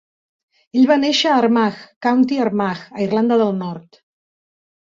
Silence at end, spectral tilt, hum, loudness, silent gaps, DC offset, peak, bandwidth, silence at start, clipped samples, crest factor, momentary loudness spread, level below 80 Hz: 1.15 s; -5.5 dB/octave; none; -17 LUFS; 1.96-2.01 s; under 0.1%; -4 dBFS; 7.6 kHz; 0.75 s; under 0.1%; 16 dB; 9 LU; -64 dBFS